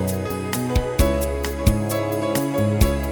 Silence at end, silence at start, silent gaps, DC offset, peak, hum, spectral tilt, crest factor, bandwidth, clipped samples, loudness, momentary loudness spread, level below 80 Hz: 0 s; 0 s; none; under 0.1%; -2 dBFS; none; -6 dB/octave; 18 dB; over 20 kHz; under 0.1%; -22 LUFS; 5 LU; -26 dBFS